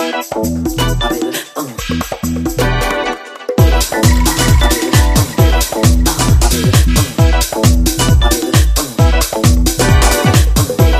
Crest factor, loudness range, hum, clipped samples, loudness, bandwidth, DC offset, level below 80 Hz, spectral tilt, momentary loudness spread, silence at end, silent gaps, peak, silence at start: 12 dB; 5 LU; none; under 0.1%; -12 LUFS; 16 kHz; under 0.1%; -16 dBFS; -4.5 dB/octave; 8 LU; 0 s; none; 0 dBFS; 0 s